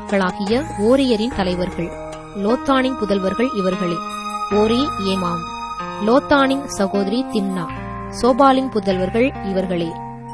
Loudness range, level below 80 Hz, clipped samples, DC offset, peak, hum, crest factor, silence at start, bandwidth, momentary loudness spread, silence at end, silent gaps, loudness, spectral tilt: 2 LU; -40 dBFS; under 0.1%; 0.2%; -2 dBFS; none; 18 dB; 0 s; 11 kHz; 12 LU; 0 s; none; -19 LUFS; -6 dB/octave